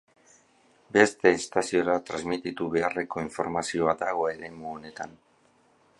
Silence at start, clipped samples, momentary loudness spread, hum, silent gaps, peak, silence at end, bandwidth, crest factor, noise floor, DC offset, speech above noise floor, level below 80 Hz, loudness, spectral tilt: 0.9 s; under 0.1%; 16 LU; none; none; -4 dBFS; 0.9 s; 11.5 kHz; 26 dB; -63 dBFS; under 0.1%; 37 dB; -62 dBFS; -26 LUFS; -4.5 dB/octave